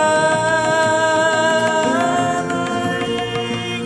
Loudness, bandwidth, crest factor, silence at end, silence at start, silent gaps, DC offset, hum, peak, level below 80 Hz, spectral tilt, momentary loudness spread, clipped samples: -17 LUFS; 11 kHz; 14 dB; 0 s; 0 s; none; under 0.1%; none; -4 dBFS; -52 dBFS; -4 dB/octave; 6 LU; under 0.1%